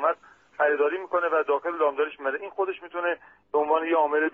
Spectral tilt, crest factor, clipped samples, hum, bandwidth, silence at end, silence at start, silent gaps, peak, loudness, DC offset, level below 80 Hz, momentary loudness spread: -0.5 dB/octave; 16 dB; under 0.1%; none; 3.7 kHz; 0.05 s; 0 s; none; -10 dBFS; -26 LUFS; under 0.1%; -74 dBFS; 7 LU